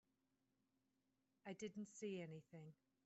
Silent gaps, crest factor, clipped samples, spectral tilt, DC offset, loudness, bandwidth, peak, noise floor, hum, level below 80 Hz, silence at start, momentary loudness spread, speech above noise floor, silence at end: none; 18 dB; under 0.1%; -6 dB/octave; under 0.1%; -54 LUFS; 8 kHz; -40 dBFS; -88 dBFS; none; under -90 dBFS; 1.45 s; 11 LU; 34 dB; 0.3 s